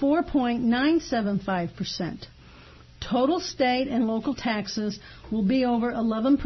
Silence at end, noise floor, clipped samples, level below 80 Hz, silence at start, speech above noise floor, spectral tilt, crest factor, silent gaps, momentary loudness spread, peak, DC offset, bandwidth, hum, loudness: 0 s; -49 dBFS; under 0.1%; -48 dBFS; 0 s; 24 dB; -5.5 dB/octave; 14 dB; none; 9 LU; -12 dBFS; under 0.1%; 6.2 kHz; none; -26 LUFS